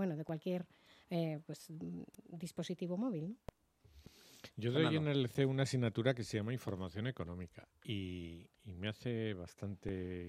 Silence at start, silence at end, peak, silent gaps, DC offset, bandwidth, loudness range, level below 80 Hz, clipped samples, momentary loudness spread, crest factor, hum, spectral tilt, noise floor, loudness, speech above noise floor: 0 s; 0 s; -18 dBFS; none; under 0.1%; 15 kHz; 7 LU; -68 dBFS; under 0.1%; 18 LU; 22 dB; none; -6.5 dB/octave; -65 dBFS; -40 LUFS; 26 dB